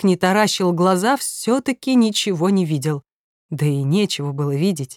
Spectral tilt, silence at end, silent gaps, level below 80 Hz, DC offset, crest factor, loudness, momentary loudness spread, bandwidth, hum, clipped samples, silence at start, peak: -5 dB/octave; 0.05 s; 3.12-3.49 s; -66 dBFS; under 0.1%; 16 dB; -19 LUFS; 6 LU; 18 kHz; none; under 0.1%; 0 s; -4 dBFS